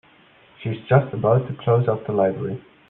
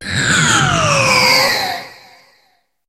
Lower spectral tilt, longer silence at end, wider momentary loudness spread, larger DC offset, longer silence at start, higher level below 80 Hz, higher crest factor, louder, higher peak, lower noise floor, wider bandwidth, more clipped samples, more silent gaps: first, -11.5 dB/octave vs -2.5 dB/octave; second, 0.3 s vs 0.95 s; about the same, 11 LU vs 9 LU; neither; first, 0.6 s vs 0 s; second, -58 dBFS vs -42 dBFS; about the same, 18 dB vs 14 dB; second, -21 LUFS vs -12 LUFS; second, -4 dBFS vs 0 dBFS; second, -53 dBFS vs -59 dBFS; second, 3.9 kHz vs 16 kHz; neither; neither